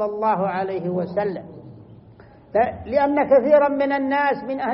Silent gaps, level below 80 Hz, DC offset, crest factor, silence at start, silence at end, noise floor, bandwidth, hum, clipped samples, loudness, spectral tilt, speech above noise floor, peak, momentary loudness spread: none; -54 dBFS; under 0.1%; 16 dB; 0 s; 0 s; -47 dBFS; 5.6 kHz; none; under 0.1%; -20 LUFS; -5.5 dB/octave; 27 dB; -4 dBFS; 9 LU